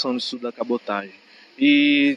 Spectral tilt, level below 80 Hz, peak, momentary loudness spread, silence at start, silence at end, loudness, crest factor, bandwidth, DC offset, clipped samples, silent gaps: -4.5 dB/octave; -78 dBFS; -8 dBFS; 13 LU; 0 s; 0 s; -21 LUFS; 14 dB; 7.6 kHz; under 0.1%; under 0.1%; none